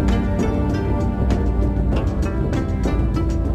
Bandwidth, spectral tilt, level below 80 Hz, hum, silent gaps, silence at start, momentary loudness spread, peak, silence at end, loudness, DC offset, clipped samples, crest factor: 8.6 kHz; -8 dB/octave; -22 dBFS; none; none; 0 s; 2 LU; -6 dBFS; 0 s; -21 LUFS; under 0.1%; under 0.1%; 12 dB